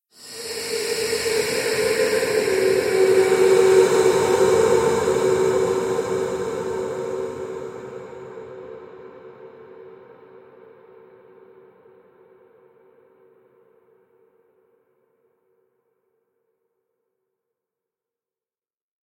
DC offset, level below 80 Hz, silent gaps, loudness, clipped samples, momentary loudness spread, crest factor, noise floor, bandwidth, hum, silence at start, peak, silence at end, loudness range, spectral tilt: under 0.1%; -58 dBFS; none; -20 LUFS; under 0.1%; 22 LU; 20 dB; under -90 dBFS; 16.5 kHz; none; 0.2 s; -4 dBFS; 9 s; 21 LU; -4 dB/octave